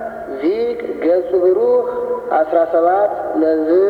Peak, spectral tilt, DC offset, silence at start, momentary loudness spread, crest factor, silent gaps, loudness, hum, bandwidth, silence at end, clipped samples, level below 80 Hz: -2 dBFS; -7.5 dB/octave; under 0.1%; 0 s; 7 LU; 12 dB; none; -16 LUFS; none; 5.2 kHz; 0 s; under 0.1%; -54 dBFS